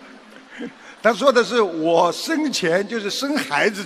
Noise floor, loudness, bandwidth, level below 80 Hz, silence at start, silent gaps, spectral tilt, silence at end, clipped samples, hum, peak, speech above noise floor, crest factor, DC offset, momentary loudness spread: -43 dBFS; -19 LUFS; 15 kHz; -70 dBFS; 0 s; none; -3.5 dB/octave; 0 s; under 0.1%; none; 0 dBFS; 24 dB; 20 dB; under 0.1%; 17 LU